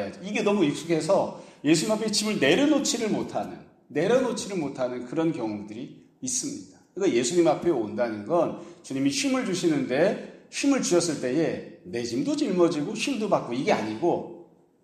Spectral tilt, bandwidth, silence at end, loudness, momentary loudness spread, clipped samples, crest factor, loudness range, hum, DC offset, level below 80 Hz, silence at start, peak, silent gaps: -4 dB/octave; 14.5 kHz; 0.4 s; -26 LUFS; 13 LU; under 0.1%; 20 dB; 4 LU; none; under 0.1%; -68 dBFS; 0 s; -6 dBFS; none